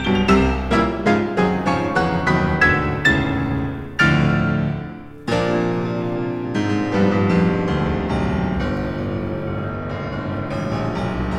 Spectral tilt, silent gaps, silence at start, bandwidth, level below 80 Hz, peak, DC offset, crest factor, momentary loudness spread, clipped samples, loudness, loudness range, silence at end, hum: -7 dB/octave; none; 0 s; 10.5 kHz; -34 dBFS; -2 dBFS; under 0.1%; 18 dB; 10 LU; under 0.1%; -20 LUFS; 5 LU; 0 s; none